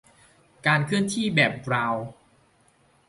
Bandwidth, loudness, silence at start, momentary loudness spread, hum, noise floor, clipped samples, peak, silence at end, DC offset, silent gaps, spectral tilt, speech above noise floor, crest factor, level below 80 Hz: 11.5 kHz; -24 LUFS; 0.65 s; 8 LU; none; -62 dBFS; under 0.1%; -6 dBFS; 0.95 s; under 0.1%; none; -5 dB/octave; 38 dB; 20 dB; -62 dBFS